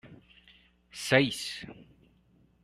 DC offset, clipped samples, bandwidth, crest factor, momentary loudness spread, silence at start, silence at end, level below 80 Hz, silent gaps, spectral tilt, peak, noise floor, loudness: under 0.1%; under 0.1%; 13.5 kHz; 26 dB; 23 LU; 0.05 s; 0.8 s; -66 dBFS; none; -4 dB/octave; -6 dBFS; -65 dBFS; -29 LUFS